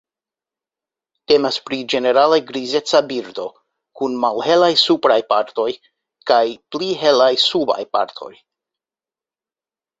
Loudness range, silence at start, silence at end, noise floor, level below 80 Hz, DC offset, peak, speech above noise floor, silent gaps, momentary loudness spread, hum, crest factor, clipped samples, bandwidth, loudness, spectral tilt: 2 LU; 1.3 s; 1.7 s; under -90 dBFS; -64 dBFS; under 0.1%; -2 dBFS; over 73 dB; none; 13 LU; none; 18 dB; under 0.1%; 8 kHz; -17 LUFS; -3.5 dB/octave